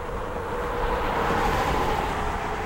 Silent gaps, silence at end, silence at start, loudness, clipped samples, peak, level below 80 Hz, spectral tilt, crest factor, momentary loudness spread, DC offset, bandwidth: none; 0 s; 0 s; -26 LUFS; under 0.1%; -12 dBFS; -32 dBFS; -5 dB/octave; 14 dB; 7 LU; under 0.1%; 16 kHz